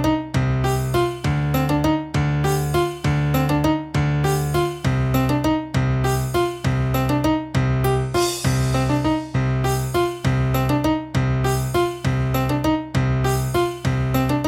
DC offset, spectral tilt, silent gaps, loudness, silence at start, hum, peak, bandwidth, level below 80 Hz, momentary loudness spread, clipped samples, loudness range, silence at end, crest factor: under 0.1%; -6.5 dB/octave; none; -21 LUFS; 0 s; none; -6 dBFS; 16.5 kHz; -32 dBFS; 2 LU; under 0.1%; 1 LU; 0 s; 12 dB